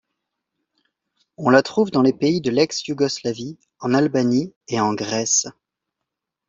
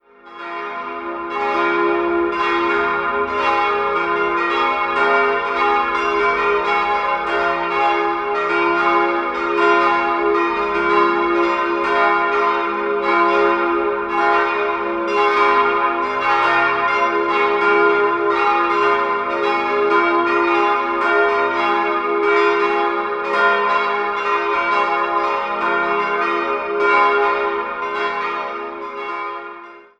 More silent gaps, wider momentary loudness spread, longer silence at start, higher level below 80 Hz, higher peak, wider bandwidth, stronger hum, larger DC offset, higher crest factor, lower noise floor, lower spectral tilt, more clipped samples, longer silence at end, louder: first, 4.56-4.61 s vs none; first, 10 LU vs 6 LU; first, 1.4 s vs 0.25 s; second, -62 dBFS vs -52 dBFS; about the same, -2 dBFS vs -2 dBFS; about the same, 7.8 kHz vs 8.4 kHz; neither; neither; about the same, 20 dB vs 16 dB; first, -82 dBFS vs -37 dBFS; about the same, -4 dB/octave vs -4.5 dB/octave; neither; first, 1 s vs 0.2 s; second, -20 LUFS vs -17 LUFS